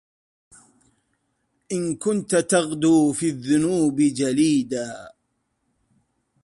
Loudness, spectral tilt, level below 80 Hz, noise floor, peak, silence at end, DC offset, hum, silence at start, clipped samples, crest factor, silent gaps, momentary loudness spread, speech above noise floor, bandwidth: -21 LUFS; -5 dB/octave; -62 dBFS; -73 dBFS; -6 dBFS; 1.35 s; under 0.1%; none; 1.7 s; under 0.1%; 18 dB; none; 11 LU; 52 dB; 11.5 kHz